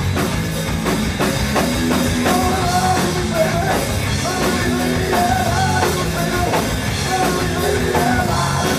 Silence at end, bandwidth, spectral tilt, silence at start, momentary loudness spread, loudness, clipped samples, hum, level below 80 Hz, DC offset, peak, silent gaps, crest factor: 0 s; 16 kHz; -4.5 dB/octave; 0 s; 3 LU; -18 LUFS; under 0.1%; none; -30 dBFS; under 0.1%; -2 dBFS; none; 14 dB